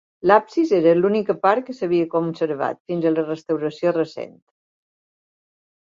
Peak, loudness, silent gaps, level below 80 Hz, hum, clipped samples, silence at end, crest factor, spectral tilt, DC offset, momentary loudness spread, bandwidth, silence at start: 0 dBFS; -20 LUFS; 2.80-2.85 s; -66 dBFS; none; under 0.1%; 1.65 s; 20 dB; -7.5 dB/octave; under 0.1%; 8 LU; 7.4 kHz; 0.25 s